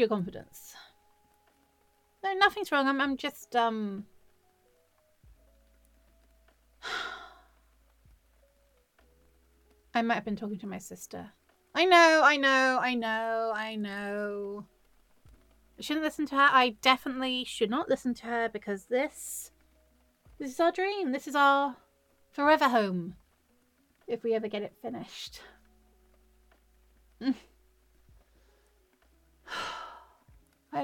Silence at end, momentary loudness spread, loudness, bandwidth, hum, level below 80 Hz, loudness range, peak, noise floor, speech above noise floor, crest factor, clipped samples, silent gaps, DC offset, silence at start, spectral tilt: 0 s; 20 LU; -28 LUFS; 17.5 kHz; none; -66 dBFS; 19 LU; -6 dBFS; -69 dBFS; 40 dB; 24 dB; under 0.1%; none; under 0.1%; 0 s; -3.5 dB/octave